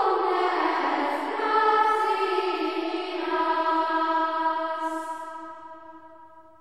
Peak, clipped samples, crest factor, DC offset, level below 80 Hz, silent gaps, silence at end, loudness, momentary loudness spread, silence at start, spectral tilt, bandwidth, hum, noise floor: -10 dBFS; under 0.1%; 16 dB; 0.2%; -78 dBFS; none; 0.2 s; -25 LUFS; 15 LU; 0 s; -2.5 dB/octave; 13 kHz; none; -50 dBFS